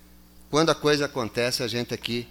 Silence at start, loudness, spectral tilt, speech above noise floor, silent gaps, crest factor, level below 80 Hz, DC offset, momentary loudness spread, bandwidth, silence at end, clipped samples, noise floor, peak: 0.5 s; -25 LUFS; -4 dB/octave; 26 dB; none; 20 dB; -54 dBFS; under 0.1%; 7 LU; 17.5 kHz; 0 s; under 0.1%; -51 dBFS; -6 dBFS